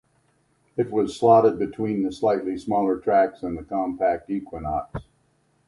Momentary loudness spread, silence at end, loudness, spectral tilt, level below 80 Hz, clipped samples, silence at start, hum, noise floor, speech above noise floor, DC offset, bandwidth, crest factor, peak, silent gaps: 13 LU; 0.65 s; -23 LUFS; -7.5 dB/octave; -50 dBFS; under 0.1%; 0.75 s; none; -65 dBFS; 43 dB; under 0.1%; 11.5 kHz; 20 dB; -4 dBFS; none